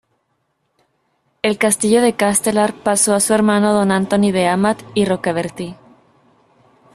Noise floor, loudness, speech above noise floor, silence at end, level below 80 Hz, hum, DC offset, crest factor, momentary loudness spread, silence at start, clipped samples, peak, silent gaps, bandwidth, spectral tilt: -68 dBFS; -16 LUFS; 52 dB; 1.2 s; -54 dBFS; none; under 0.1%; 18 dB; 8 LU; 1.45 s; under 0.1%; 0 dBFS; none; 14 kHz; -4 dB/octave